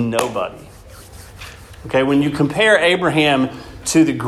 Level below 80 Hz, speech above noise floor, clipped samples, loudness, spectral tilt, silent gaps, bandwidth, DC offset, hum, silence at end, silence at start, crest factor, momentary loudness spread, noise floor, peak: -44 dBFS; 23 dB; under 0.1%; -16 LUFS; -4.5 dB/octave; none; 14 kHz; under 0.1%; none; 0 s; 0 s; 18 dB; 23 LU; -39 dBFS; 0 dBFS